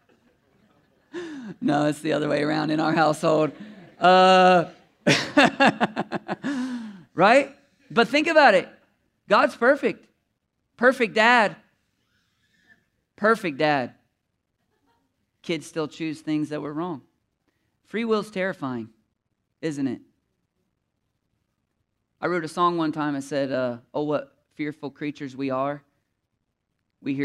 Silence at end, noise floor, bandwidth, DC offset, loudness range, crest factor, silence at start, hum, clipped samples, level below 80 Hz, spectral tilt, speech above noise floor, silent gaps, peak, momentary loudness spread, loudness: 0 s; -77 dBFS; 13 kHz; under 0.1%; 12 LU; 20 dB; 1.15 s; none; under 0.1%; -72 dBFS; -5 dB/octave; 56 dB; none; -4 dBFS; 17 LU; -22 LUFS